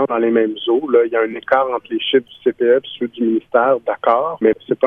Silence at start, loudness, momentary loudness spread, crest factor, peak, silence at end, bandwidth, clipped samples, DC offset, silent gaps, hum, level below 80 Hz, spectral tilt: 0 s; -17 LUFS; 5 LU; 16 dB; 0 dBFS; 0 s; 3.8 kHz; under 0.1%; under 0.1%; none; none; -62 dBFS; -7.5 dB/octave